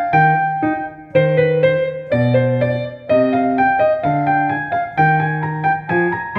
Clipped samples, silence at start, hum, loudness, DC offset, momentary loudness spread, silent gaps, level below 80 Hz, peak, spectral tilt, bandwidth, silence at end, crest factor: under 0.1%; 0 s; none; -16 LUFS; under 0.1%; 6 LU; none; -52 dBFS; -2 dBFS; -9.5 dB/octave; 5.2 kHz; 0 s; 14 dB